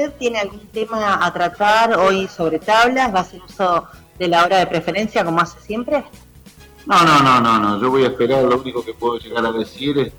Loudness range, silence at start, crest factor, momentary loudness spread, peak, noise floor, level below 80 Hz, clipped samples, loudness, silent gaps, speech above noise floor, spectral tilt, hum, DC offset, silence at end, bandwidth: 3 LU; 0 s; 12 dB; 10 LU; -4 dBFS; -43 dBFS; -48 dBFS; under 0.1%; -17 LUFS; none; 27 dB; -5 dB/octave; none; under 0.1%; 0.1 s; over 20 kHz